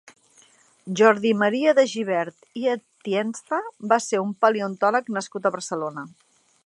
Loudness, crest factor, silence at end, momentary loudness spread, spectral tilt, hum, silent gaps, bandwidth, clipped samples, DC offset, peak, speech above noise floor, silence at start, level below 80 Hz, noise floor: -23 LUFS; 22 dB; 0.6 s; 11 LU; -4.5 dB/octave; none; none; 11.5 kHz; under 0.1%; under 0.1%; -2 dBFS; 34 dB; 0.85 s; -78 dBFS; -57 dBFS